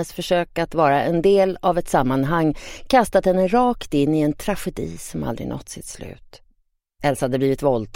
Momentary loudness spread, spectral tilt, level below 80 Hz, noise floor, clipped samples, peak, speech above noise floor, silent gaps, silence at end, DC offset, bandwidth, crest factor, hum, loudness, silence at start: 13 LU; -6 dB/octave; -40 dBFS; -65 dBFS; under 0.1%; -4 dBFS; 45 dB; none; 0.1 s; under 0.1%; 16.5 kHz; 18 dB; none; -20 LUFS; 0 s